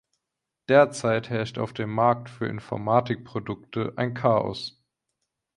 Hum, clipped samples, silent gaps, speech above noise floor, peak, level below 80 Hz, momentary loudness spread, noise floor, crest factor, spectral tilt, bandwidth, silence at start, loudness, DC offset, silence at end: none; under 0.1%; none; 60 dB; -6 dBFS; -60 dBFS; 13 LU; -84 dBFS; 20 dB; -6.5 dB/octave; 11 kHz; 0.7 s; -25 LUFS; under 0.1%; 0.85 s